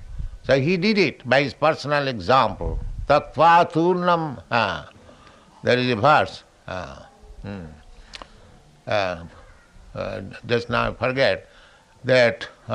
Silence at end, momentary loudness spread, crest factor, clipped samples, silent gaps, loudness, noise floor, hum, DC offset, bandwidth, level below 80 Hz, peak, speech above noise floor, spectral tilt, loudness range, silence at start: 0 s; 20 LU; 20 dB; under 0.1%; none; -21 LUFS; -51 dBFS; none; under 0.1%; 11 kHz; -42 dBFS; -4 dBFS; 31 dB; -6 dB/octave; 12 LU; 0 s